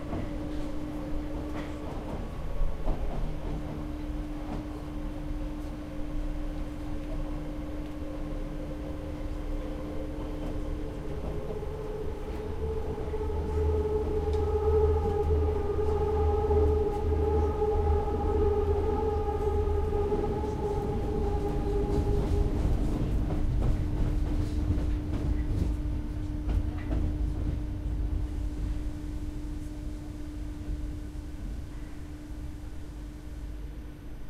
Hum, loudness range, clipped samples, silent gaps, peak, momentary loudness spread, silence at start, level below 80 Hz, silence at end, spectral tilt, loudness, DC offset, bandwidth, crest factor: none; 10 LU; under 0.1%; none; -14 dBFS; 12 LU; 0 s; -32 dBFS; 0 s; -8.5 dB/octave; -32 LUFS; under 0.1%; 12.5 kHz; 16 dB